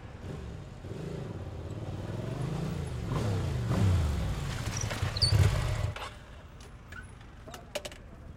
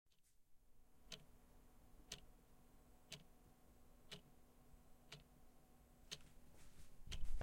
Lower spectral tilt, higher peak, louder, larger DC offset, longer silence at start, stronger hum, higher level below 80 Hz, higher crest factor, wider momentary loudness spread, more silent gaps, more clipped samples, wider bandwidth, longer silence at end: first, -5.5 dB/octave vs -3 dB/octave; first, -12 dBFS vs -30 dBFS; first, -33 LUFS vs -59 LUFS; neither; second, 0 s vs 0.4 s; neither; first, -42 dBFS vs -58 dBFS; about the same, 20 dB vs 20 dB; first, 20 LU vs 11 LU; neither; neither; about the same, 16 kHz vs 16 kHz; about the same, 0 s vs 0 s